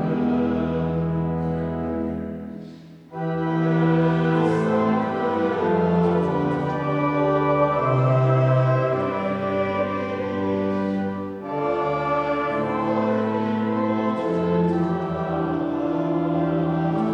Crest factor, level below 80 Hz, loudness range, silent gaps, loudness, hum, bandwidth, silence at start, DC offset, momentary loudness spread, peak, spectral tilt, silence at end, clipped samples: 14 dB; -50 dBFS; 4 LU; none; -23 LUFS; none; 7.2 kHz; 0 s; under 0.1%; 7 LU; -8 dBFS; -9 dB/octave; 0 s; under 0.1%